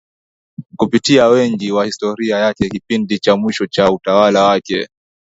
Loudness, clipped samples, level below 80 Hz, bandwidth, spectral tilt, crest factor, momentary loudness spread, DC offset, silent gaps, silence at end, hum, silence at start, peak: -14 LUFS; under 0.1%; -48 dBFS; 8 kHz; -5 dB/octave; 14 dB; 10 LU; under 0.1%; none; 0.35 s; none; 0.6 s; 0 dBFS